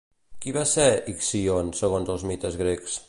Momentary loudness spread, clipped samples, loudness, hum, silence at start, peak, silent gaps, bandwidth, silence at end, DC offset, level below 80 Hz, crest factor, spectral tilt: 10 LU; under 0.1%; -24 LUFS; none; 0.3 s; -6 dBFS; none; 11.5 kHz; 0.05 s; under 0.1%; -44 dBFS; 20 dB; -4 dB/octave